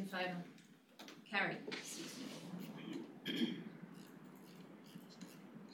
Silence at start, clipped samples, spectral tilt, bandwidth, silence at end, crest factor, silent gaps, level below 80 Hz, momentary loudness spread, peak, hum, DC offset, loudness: 0 s; under 0.1%; -4 dB/octave; 19 kHz; 0 s; 22 dB; none; under -90 dBFS; 18 LU; -24 dBFS; none; under 0.1%; -45 LUFS